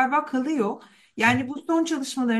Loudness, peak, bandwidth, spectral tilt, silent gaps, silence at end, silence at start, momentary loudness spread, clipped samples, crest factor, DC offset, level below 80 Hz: -24 LUFS; -6 dBFS; 12.5 kHz; -4.5 dB/octave; none; 0 s; 0 s; 9 LU; under 0.1%; 18 dB; under 0.1%; -66 dBFS